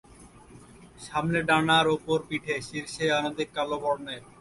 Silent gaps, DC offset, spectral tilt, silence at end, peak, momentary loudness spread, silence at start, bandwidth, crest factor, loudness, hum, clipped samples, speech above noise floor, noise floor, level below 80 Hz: none; under 0.1%; -4.5 dB/octave; 0.15 s; -8 dBFS; 11 LU; 0.2 s; 11.5 kHz; 20 dB; -27 LUFS; none; under 0.1%; 24 dB; -51 dBFS; -58 dBFS